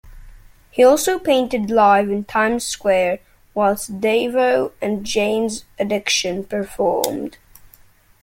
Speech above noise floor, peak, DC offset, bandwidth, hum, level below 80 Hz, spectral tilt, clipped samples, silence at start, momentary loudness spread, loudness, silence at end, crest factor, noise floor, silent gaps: 32 dB; 0 dBFS; under 0.1%; 16.5 kHz; none; -48 dBFS; -3.5 dB/octave; under 0.1%; 0.05 s; 11 LU; -18 LUFS; 0.85 s; 20 dB; -50 dBFS; none